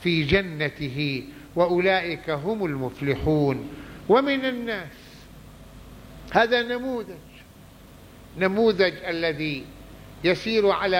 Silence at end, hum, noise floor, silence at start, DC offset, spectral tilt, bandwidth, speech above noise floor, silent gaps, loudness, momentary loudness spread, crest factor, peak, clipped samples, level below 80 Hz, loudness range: 0 s; none; -48 dBFS; 0 s; under 0.1%; -6.5 dB/octave; 16.5 kHz; 24 dB; none; -24 LUFS; 20 LU; 20 dB; -4 dBFS; under 0.1%; -48 dBFS; 4 LU